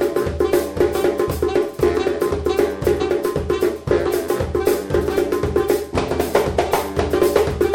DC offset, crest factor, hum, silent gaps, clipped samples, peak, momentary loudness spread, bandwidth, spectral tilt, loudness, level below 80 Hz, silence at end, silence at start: under 0.1%; 14 dB; none; none; under 0.1%; -4 dBFS; 3 LU; 17 kHz; -6 dB/octave; -19 LUFS; -34 dBFS; 0 s; 0 s